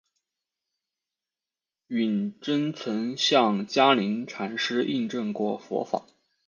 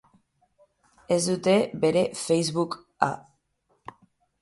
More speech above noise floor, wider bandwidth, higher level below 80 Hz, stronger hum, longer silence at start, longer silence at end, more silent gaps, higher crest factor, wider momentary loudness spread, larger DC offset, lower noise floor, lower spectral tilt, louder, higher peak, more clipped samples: first, over 64 dB vs 47 dB; second, 7.6 kHz vs 11.5 kHz; second, -76 dBFS vs -66 dBFS; neither; first, 1.9 s vs 1.1 s; second, 0.45 s vs 1.25 s; neither; about the same, 22 dB vs 24 dB; second, 10 LU vs 25 LU; neither; first, under -90 dBFS vs -71 dBFS; about the same, -4.5 dB/octave vs -5 dB/octave; about the same, -26 LUFS vs -25 LUFS; about the same, -4 dBFS vs -4 dBFS; neither